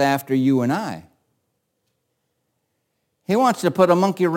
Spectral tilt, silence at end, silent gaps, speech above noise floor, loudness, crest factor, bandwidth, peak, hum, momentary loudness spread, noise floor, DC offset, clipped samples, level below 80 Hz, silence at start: -6.5 dB/octave; 0 s; none; 55 dB; -19 LUFS; 18 dB; 17 kHz; -4 dBFS; none; 15 LU; -73 dBFS; under 0.1%; under 0.1%; -70 dBFS; 0 s